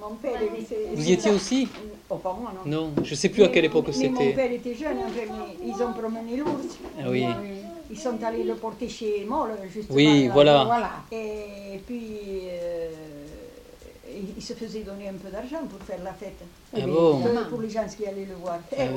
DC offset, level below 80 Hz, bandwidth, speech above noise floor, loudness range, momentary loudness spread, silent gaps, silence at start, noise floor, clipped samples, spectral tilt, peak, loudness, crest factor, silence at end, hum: under 0.1%; -52 dBFS; 16.5 kHz; 21 dB; 14 LU; 18 LU; none; 0 s; -47 dBFS; under 0.1%; -5.5 dB/octave; -4 dBFS; -25 LUFS; 22 dB; 0 s; none